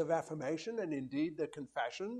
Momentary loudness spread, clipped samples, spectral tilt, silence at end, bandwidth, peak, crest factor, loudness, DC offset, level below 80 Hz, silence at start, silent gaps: 4 LU; under 0.1%; -5.5 dB/octave; 0 s; 11.5 kHz; -20 dBFS; 18 dB; -39 LUFS; under 0.1%; -78 dBFS; 0 s; none